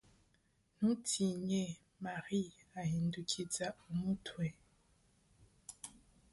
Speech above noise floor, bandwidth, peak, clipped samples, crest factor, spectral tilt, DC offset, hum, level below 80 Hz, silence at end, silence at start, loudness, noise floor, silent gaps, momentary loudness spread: 37 dB; 11.5 kHz; -20 dBFS; under 0.1%; 20 dB; -5 dB/octave; under 0.1%; none; -68 dBFS; 0.4 s; 0.8 s; -39 LUFS; -75 dBFS; none; 15 LU